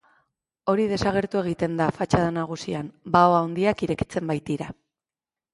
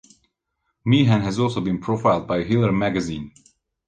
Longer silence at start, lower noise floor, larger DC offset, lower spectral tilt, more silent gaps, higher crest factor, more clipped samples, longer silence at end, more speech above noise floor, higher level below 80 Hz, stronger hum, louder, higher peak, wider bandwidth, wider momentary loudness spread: second, 0.65 s vs 0.85 s; first, under -90 dBFS vs -75 dBFS; neither; about the same, -6.5 dB/octave vs -7 dB/octave; neither; about the same, 22 dB vs 18 dB; neither; first, 0.8 s vs 0.6 s; first, over 67 dB vs 55 dB; about the same, -50 dBFS vs -48 dBFS; neither; second, -24 LUFS vs -21 LUFS; about the same, -4 dBFS vs -4 dBFS; first, 11.5 kHz vs 9.2 kHz; about the same, 12 LU vs 12 LU